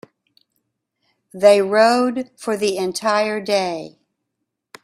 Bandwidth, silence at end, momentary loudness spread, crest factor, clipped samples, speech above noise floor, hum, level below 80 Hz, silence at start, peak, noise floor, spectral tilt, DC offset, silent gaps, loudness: 14.5 kHz; 0.95 s; 12 LU; 20 dB; under 0.1%; 61 dB; none; -66 dBFS; 1.35 s; 0 dBFS; -78 dBFS; -4 dB/octave; under 0.1%; none; -18 LUFS